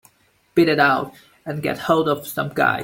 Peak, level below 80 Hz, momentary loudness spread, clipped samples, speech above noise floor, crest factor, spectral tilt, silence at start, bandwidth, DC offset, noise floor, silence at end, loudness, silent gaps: -2 dBFS; -58 dBFS; 14 LU; under 0.1%; 41 dB; 18 dB; -5.5 dB/octave; 0.55 s; 17 kHz; under 0.1%; -60 dBFS; 0 s; -20 LUFS; none